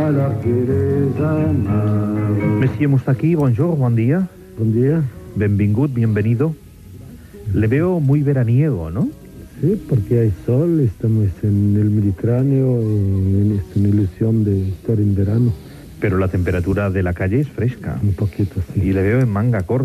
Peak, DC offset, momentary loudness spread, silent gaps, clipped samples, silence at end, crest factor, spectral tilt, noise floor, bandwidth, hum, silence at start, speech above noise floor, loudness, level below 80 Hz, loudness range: -4 dBFS; under 0.1%; 6 LU; none; under 0.1%; 0 s; 12 dB; -10 dB/octave; -37 dBFS; 13 kHz; none; 0 s; 21 dB; -18 LUFS; -42 dBFS; 2 LU